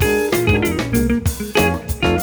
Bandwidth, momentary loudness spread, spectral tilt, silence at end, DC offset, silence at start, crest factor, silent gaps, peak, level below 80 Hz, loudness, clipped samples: over 20 kHz; 3 LU; -5 dB/octave; 0 s; under 0.1%; 0 s; 16 dB; none; -2 dBFS; -28 dBFS; -18 LUFS; under 0.1%